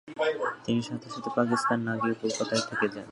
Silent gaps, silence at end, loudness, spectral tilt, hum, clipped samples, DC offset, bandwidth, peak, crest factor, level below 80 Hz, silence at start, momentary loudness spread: none; 0 s; -29 LUFS; -4.5 dB/octave; none; under 0.1%; under 0.1%; 11.5 kHz; -10 dBFS; 20 dB; -68 dBFS; 0.05 s; 6 LU